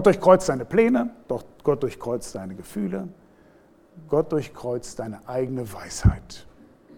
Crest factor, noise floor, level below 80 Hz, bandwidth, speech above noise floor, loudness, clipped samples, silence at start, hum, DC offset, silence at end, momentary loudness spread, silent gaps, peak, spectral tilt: 22 dB; -55 dBFS; -38 dBFS; 17 kHz; 32 dB; -24 LUFS; under 0.1%; 0 s; none; under 0.1%; 0.55 s; 16 LU; none; -2 dBFS; -6.5 dB/octave